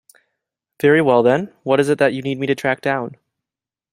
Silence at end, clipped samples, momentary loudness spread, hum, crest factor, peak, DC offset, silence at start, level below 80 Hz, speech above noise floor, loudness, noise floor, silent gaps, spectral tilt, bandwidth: 0.85 s; under 0.1%; 9 LU; none; 16 dB; -2 dBFS; under 0.1%; 0.85 s; -62 dBFS; 72 dB; -17 LUFS; -89 dBFS; none; -6.5 dB/octave; 15.5 kHz